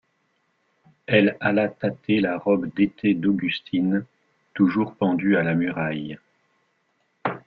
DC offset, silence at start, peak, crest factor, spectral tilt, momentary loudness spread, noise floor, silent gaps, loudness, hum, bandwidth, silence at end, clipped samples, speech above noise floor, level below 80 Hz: under 0.1%; 1.1 s; -2 dBFS; 20 dB; -9.5 dB/octave; 11 LU; -70 dBFS; none; -23 LUFS; none; 5.2 kHz; 0.1 s; under 0.1%; 48 dB; -62 dBFS